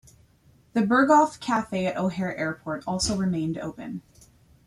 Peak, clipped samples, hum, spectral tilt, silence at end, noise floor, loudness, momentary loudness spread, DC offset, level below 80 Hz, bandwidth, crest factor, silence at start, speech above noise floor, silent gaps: -6 dBFS; under 0.1%; none; -5 dB/octave; 0.65 s; -59 dBFS; -25 LUFS; 15 LU; under 0.1%; -54 dBFS; 13 kHz; 20 dB; 0.75 s; 34 dB; none